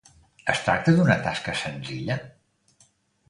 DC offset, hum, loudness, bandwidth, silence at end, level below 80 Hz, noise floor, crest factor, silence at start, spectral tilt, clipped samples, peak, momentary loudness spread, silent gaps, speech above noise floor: under 0.1%; none; -24 LUFS; 11 kHz; 1 s; -54 dBFS; -63 dBFS; 22 dB; 0.45 s; -6 dB/octave; under 0.1%; -4 dBFS; 12 LU; none; 39 dB